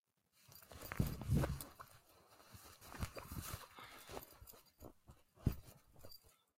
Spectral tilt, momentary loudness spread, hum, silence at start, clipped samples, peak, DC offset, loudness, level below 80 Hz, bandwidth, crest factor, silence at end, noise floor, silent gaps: -6 dB/octave; 24 LU; none; 0.5 s; under 0.1%; -22 dBFS; under 0.1%; -46 LUFS; -54 dBFS; 16 kHz; 26 dB; 0.4 s; -73 dBFS; none